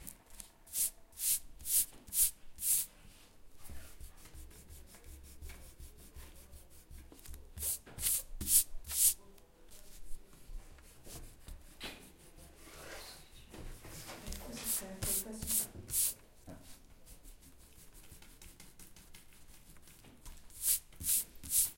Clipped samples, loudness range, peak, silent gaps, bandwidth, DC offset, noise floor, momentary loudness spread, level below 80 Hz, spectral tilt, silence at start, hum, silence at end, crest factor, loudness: under 0.1%; 22 LU; -12 dBFS; none; 16.5 kHz; under 0.1%; -58 dBFS; 26 LU; -54 dBFS; -1 dB/octave; 0 s; none; 0 s; 28 dB; -33 LUFS